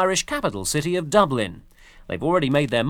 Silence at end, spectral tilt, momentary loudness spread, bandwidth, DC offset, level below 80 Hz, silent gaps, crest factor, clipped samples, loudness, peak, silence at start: 0 s; -4.5 dB/octave; 8 LU; 19.5 kHz; under 0.1%; -46 dBFS; none; 22 dB; under 0.1%; -22 LUFS; 0 dBFS; 0 s